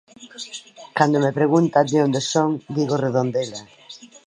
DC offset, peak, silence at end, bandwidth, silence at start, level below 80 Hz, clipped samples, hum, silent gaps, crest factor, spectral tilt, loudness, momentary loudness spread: under 0.1%; -2 dBFS; 0.2 s; 10.5 kHz; 0.2 s; -70 dBFS; under 0.1%; none; none; 20 dB; -5.5 dB/octave; -20 LUFS; 20 LU